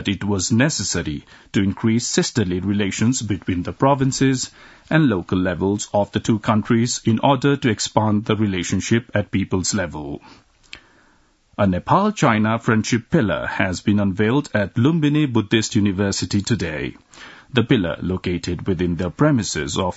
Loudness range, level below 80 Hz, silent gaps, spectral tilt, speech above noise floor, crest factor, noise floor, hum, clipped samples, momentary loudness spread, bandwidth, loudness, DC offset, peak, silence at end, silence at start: 3 LU; -48 dBFS; none; -5 dB/octave; 38 dB; 20 dB; -57 dBFS; none; under 0.1%; 7 LU; 8 kHz; -20 LUFS; under 0.1%; 0 dBFS; 0 s; 0 s